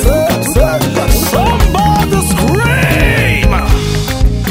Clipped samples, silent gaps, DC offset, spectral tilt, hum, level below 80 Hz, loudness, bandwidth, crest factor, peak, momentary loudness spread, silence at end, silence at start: 0.3%; none; under 0.1%; -5 dB/octave; none; -14 dBFS; -11 LUFS; 16.5 kHz; 10 dB; 0 dBFS; 4 LU; 0 s; 0 s